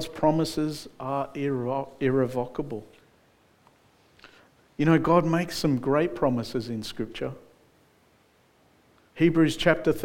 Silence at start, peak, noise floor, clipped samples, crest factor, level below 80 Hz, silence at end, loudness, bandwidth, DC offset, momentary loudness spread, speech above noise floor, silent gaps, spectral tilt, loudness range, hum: 0 s; -6 dBFS; -62 dBFS; under 0.1%; 22 dB; -52 dBFS; 0 s; -26 LUFS; 17 kHz; under 0.1%; 13 LU; 37 dB; none; -6.5 dB/octave; 6 LU; none